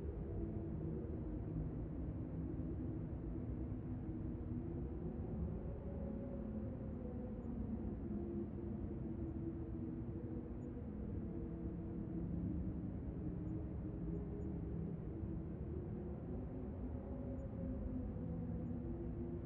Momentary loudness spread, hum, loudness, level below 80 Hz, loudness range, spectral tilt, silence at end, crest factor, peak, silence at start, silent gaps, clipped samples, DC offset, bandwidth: 2 LU; none; -46 LUFS; -52 dBFS; 1 LU; -12 dB/octave; 0 s; 12 dB; -32 dBFS; 0 s; none; under 0.1%; under 0.1%; 3.4 kHz